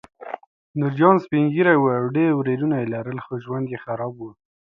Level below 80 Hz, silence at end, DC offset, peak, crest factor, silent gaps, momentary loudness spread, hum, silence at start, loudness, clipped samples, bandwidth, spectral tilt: -66 dBFS; 0.35 s; under 0.1%; 0 dBFS; 20 dB; 0.47-0.74 s; 19 LU; none; 0.2 s; -21 LUFS; under 0.1%; 5.4 kHz; -10 dB/octave